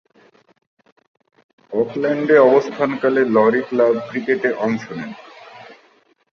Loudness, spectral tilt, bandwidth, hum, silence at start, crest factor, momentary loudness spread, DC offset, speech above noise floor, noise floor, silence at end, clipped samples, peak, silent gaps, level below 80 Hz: -17 LUFS; -7 dB/octave; 6.8 kHz; none; 1.7 s; 18 dB; 17 LU; under 0.1%; 40 dB; -56 dBFS; 0.6 s; under 0.1%; -2 dBFS; none; -66 dBFS